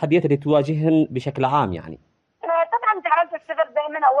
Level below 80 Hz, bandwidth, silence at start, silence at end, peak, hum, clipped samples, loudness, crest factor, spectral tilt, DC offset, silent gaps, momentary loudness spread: -62 dBFS; 8.4 kHz; 0 s; 0 s; -6 dBFS; none; under 0.1%; -20 LUFS; 16 dB; -8.5 dB/octave; under 0.1%; none; 7 LU